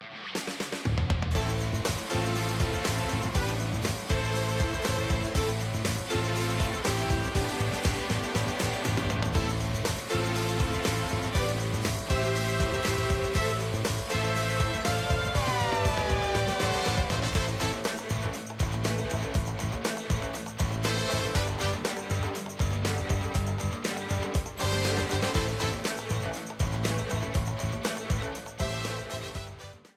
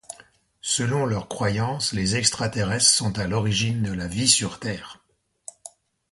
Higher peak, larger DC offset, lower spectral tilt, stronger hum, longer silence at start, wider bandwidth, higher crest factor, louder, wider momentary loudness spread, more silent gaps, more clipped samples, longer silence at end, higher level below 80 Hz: second, -12 dBFS vs -2 dBFS; neither; first, -4.5 dB/octave vs -3 dB/octave; neither; about the same, 0 s vs 0.1 s; first, 16 kHz vs 11.5 kHz; second, 16 dB vs 22 dB; second, -29 LUFS vs -22 LUFS; second, 5 LU vs 22 LU; neither; neither; second, 0.2 s vs 0.45 s; first, -38 dBFS vs -48 dBFS